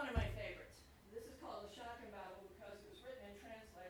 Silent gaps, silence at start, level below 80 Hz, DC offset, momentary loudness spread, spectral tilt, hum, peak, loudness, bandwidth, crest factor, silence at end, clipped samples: none; 0 s; -56 dBFS; under 0.1%; 12 LU; -6 dB/octave; none; -26 dBFS; -52 LUFS; over 20 kHz; 24 dB; 0 s; under 0.1%